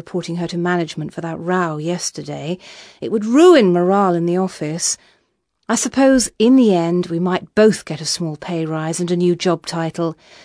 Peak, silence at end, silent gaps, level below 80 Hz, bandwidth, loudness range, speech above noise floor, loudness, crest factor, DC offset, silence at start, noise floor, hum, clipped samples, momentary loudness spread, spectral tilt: 0 dBFS; 0.3 s; none; -54 dBFS; 11 kHz; 3 LU; 50 dB; -17 LUFS; 18 dB; under 0.1%; 0.05 s; -67 dBFS; none; under 0.1%; 13 LU; -5 dB/octave